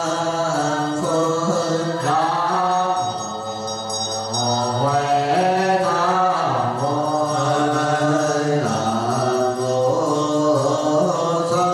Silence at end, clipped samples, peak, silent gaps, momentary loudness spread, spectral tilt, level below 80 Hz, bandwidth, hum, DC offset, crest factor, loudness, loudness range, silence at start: 0 s; under 0.1%; -8 dBFS; none; 4 LU; -5 dB/octave; -60 dBFS; 14 kHz; none; under 0.1%; 12 dB; -20 LUFS; 2 LU; 0 s